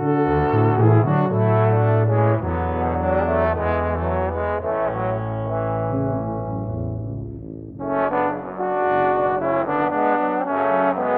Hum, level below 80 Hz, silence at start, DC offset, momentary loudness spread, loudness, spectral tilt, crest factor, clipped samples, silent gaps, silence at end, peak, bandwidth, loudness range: none; -38 dBFS; 0 s; under 0.1%; 9 LU; -21 LUFS; -12 dB/octave; 16 dB; under 0.1%; none; 0 s; -4 dBFS; 4.2 kHz; 6 LU